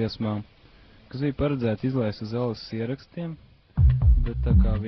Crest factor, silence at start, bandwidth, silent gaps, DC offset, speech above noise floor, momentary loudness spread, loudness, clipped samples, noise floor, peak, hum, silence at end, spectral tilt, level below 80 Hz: 16 dB; 0 s; 6 kHz; none; under 0.1%; 27 dB; 14 LU; -26 LUFS; under 0.1%; -52 dBFS; -8 dBFS; none; 0 s; -8 dB/octave; -28 dBFS